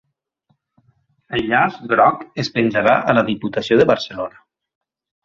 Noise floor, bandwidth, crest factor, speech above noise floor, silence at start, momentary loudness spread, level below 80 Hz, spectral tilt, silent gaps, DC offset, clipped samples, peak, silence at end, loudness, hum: -66 dBFS; 7.6 kHz; 18 dB; 49 dB; 1.3 s; 11 LU; -54 dBFS; -6 dB/octave; none; under 0.1%; under 0.1%; -2 dBFS; 0.95 s; -17 LUFS; none